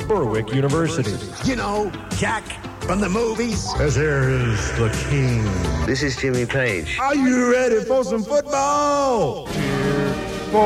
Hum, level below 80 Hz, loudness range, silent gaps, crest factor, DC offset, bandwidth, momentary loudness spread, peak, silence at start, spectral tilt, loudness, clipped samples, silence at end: none; -34 dBFS; 3 LU; none; 14 dB; under 0.1%; 14.5 kHz; 6 LU; -6 dBFS; 0 s; -5.5 dB/octave; -21 LUFS; under 0.1%; 0 s